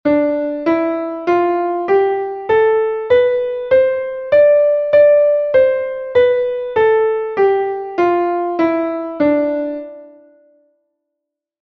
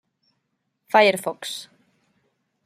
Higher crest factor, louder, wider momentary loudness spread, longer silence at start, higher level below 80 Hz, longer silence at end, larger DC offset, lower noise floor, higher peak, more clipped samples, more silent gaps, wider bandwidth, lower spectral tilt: second, 14 dB vs 24 dB; first, -15 LUFS vs -21 LUFS; second, 9 LU vs 16 LU; second, 0.05 s vs 0.95 s; first, -54 dBFS vs -80 dBFS; first, 1.55 s vs 1 s; neither; first, -80 dBFS vs -75 dBFS; about the same, -2 dBFS vs -2 dBFS; neither; neither; second, 5.8 kHz vs 15.5 kHz; first, -7.5 dB/octave vs -3 dB/octave